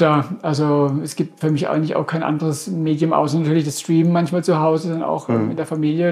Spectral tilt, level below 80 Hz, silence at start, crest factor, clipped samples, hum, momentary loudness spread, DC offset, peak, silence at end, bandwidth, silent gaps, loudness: -7 dB/octave; -66 dBFS; 0 s; 16 dB; under 0.1%; none; 5 LU; under 0.1%; -2 dBFS; 0 s; 15 kHz; none; -19 LUFS